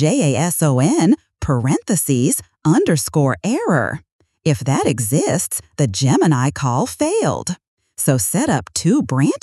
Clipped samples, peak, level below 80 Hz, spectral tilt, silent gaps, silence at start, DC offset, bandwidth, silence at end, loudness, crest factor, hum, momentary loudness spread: under 0.1%; -2 dBFS; -46 dBFS; -5.5 dB/octave; 4.12-4.19 s, 7.68-7.77 s; 0 s; under 0.1%; 13.5 kHz; 0.05 s; -17 LUFS; 14 dB; none; 6 LU